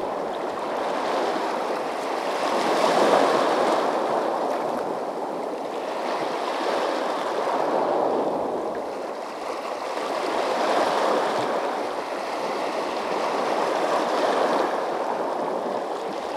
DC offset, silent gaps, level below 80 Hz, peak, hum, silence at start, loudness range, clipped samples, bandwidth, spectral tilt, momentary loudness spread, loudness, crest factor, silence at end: under 0.1%; none; -70 dBFS; -6 dBFS; none; 0 s; 4 LU; under 0.1%; 16 kHz; -3.5 dB/octave; 8 LU; -25 LUFS; 18 dB; 0 s